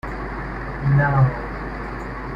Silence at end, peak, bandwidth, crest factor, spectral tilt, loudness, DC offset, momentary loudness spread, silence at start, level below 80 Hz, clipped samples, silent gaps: 0 s; -6 dBFS; 5.4 kHz; 16 dB; -9.5 dB/octave; -22 LUFS; under 0.1%; 13 LU; 0.05 s; -34 dBFS; under 0.1%; none